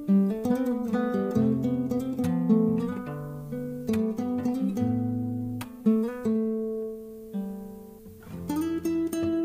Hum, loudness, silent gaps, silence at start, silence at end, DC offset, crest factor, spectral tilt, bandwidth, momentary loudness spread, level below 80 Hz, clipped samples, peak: none; -28 LUFS; none; 0 s; 0 s; under 0.1%; 16 dB; -8 dB/octave; 16 kHz; 13 LU; -58 dBFS; under 0.1%; -12 dBFS